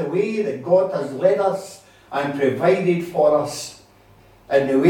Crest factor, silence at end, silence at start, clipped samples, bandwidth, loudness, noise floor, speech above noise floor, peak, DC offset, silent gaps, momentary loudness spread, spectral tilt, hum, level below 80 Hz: 18 dB; 0 s; 0 s; under 0.1%; 16.5 kHz; -20 LUFS; -51 dBFS; 32 dB; -2 dBFS; under 0.1%; none; 11 LU; -6 dB/octave; none; -60 dBFS